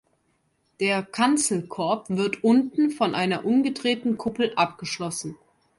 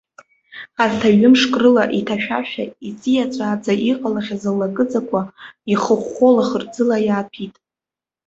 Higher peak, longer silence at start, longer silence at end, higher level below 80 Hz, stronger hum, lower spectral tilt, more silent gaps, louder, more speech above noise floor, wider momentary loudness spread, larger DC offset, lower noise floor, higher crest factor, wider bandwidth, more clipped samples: second, -8 dBFS vs -2 dBFS; first, 0.8 s vs 0.55 s; second, 0.45 s vs 0.8 s; second, -66 dBFS vs -58 dBFS; neither; second, -4 dB/octave vs -5.5 dB/octave; neither; second, -24 LUFS vs -17 LUFS; second, 46 dB vs 72 dB; second, 9 LU vs 15 LU; neither; second, -69 dBFS vs -89 dBFS; about the same, 18 dB vs 16 dB; first, 11.5 kHz vs 7.8 kHz; neither